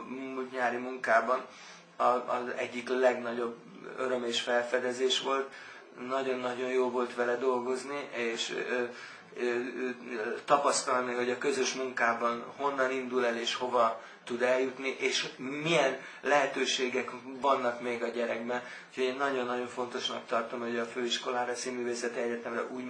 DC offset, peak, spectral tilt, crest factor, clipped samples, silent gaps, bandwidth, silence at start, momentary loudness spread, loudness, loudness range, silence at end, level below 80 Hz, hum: under 0.1%; -12 dBFS; -2.5 dB/octave; 20 dB; under 0.1%; none; 10.5 kHz; 0 s; 9 LU; -31 LUFS; 3 LU; 0 s; -80 dBFS; none